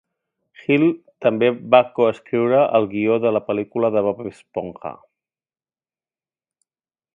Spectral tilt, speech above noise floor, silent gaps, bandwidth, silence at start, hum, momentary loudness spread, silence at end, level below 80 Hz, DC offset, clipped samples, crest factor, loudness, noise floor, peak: -8 dB/octave; over 71 dB; none; 7.2 kHz; 0.7 s; none; 14 LU; 2.2 s; -64 dBFS; under 0.1%; under 0.1%; 20 dB; -19 LUFS; under -90 dBFS; 0 dBFS